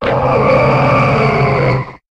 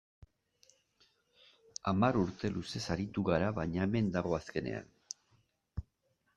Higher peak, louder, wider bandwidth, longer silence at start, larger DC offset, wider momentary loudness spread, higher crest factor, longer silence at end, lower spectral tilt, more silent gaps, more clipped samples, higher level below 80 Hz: first, -2 dBFS vs -14 dBFS; first, -12 LUFS vs -34 LUFS; second, 8.2 kHz vs 11.5 kHz; second, 0 s vs 1.85 s; neither; second, 4 LU vs 17 LU; second, 10 dB vs 22 dB; second, 0.15 s vs 0.55 s; first, -8 dB/octave vs -6.5 dB/octave; neither; neither; first, -32 dBFS vs -58 dBFS